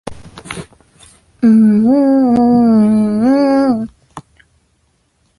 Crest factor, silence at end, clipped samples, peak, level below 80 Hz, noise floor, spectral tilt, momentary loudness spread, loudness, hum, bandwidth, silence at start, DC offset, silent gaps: 10 dB; 1.2 s; under 0.1%; -2 dBFS; -46 dBFS; -59 dBFS; -8 dB/octave; 19 LU; -11 LUFS; none; 11.5 kHz; 0.05 s; under 0.1%; none